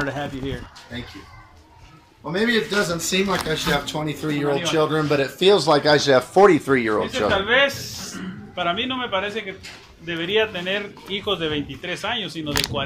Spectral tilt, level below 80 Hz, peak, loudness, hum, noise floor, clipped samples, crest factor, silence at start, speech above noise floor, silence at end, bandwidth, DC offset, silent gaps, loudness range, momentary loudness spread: -4 dB/octave; -48 dBFS; -2 dBFS; -21 LUFS; none; -48 dBFS; under 0.1%; 20 dB; 0 s; 27 dB; 0 s; 16 kHz; under 0.1%; none; 7 LU; 17 LU